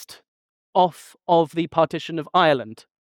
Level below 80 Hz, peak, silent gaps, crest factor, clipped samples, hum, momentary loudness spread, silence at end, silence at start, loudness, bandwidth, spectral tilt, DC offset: -64 dBFS; -4 dBFS; 0.28-0.73 s; 18 dB; under 0.1%; none; 10 LU; 0.35 s; 0 s; -21 LUFS; 19 kHz; -6 dB/octave; under 0.1%